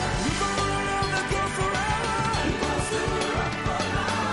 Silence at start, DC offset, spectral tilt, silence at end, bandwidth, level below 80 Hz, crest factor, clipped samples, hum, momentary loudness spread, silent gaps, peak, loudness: 0 s; under 0.1%; -4 dB/octave; 0 s; 11.5 kHz; -38 dBFS; 14 dB; under 0.1%; none; 1 LU; none; -12 dBFS; -26 LUFS